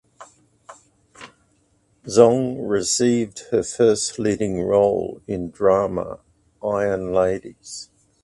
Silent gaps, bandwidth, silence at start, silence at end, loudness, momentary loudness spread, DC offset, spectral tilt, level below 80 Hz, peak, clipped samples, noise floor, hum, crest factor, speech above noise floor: none; 11.5 kHz; 0.2 s; 0.4 s; -20 LUFS; 17 LU; under 0.1%; -4.5 dB/octave; -52 dBFS; 0 dBFS; under 0.1%; -63 dBFS; none; 22 dB; 43 dB